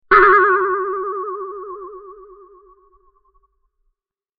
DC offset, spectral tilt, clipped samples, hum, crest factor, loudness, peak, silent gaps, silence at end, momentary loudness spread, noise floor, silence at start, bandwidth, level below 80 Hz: under 0.1%; -1.5 dB/octave; under 0.1%; none; 20 dB; -15 LUFS; 0 dBFS; none; 2.25 s; 24 LU; -72 dBFS; 0.1 s; 5.2 kHz; -50 dBFS